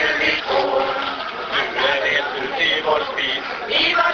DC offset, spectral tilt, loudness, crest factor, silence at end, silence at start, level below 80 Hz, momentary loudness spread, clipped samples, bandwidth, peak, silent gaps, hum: under 0.1%; -2.5 dB/octave; -19 LUFS; 16 dB; 0 s; 0 s; -52 dBFS; 7 LU; under 0.1%; 7 kHz; -4 dBFS; none; none